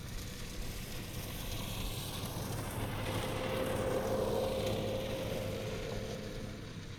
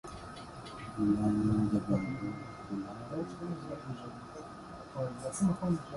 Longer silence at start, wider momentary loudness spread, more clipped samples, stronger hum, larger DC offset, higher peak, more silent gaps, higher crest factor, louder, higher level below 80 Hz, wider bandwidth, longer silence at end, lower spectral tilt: about the same, 0 s vs 0.05 s; second, 9 LU vs 16 LU; neither; neither; neither; second, -22 dBFS vs -18 dBFS; neither; about the same, 14 dB vs 18 dB; second, -38 LUFS vs -35 LUFS; first, -48 dBFS vs -56 dBFS; first, over 20 kHz vs 11.5 kHz; about the same, 0 s vs 0 s; second, -5 dB/octave vs -7 dB/octave